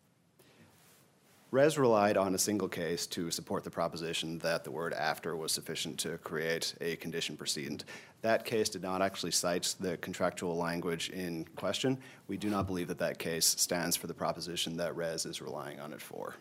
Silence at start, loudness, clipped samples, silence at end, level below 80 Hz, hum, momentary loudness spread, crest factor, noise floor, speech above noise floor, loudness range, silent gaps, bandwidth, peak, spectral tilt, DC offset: 0.6 s; -34 LUFS; under 0.1%; 0 s; -70 dBFS; none; 10 LU; 22 dB; -66 dBFS; 32 dB; 4 LU; none; 16 kHz; -14 dBFS; -3 dB/octave; under 0.1%